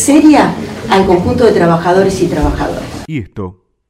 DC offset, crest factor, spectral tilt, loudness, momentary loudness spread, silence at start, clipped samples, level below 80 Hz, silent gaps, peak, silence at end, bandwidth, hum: under 0.1%; 10 dB; -5.5 dB/octave; -11 LUFS; 15 LU; 0 s; 0.5%; -28 dBFS; none; 0 dBFS; 0.4 s; 15.5 kHz; none